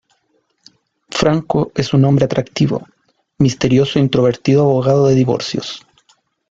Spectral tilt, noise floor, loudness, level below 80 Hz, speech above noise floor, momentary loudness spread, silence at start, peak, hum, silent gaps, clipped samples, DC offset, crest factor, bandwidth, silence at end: -6.5 dB/octave; -63 dBFS; -15 LUFS; -46 dBFS; 49 dB; 10 LU; 1.1 s; 0 dBFS; none; none; under 0.1%; under 0.1%; 16 dB; 7.8 kHz; 0.7 s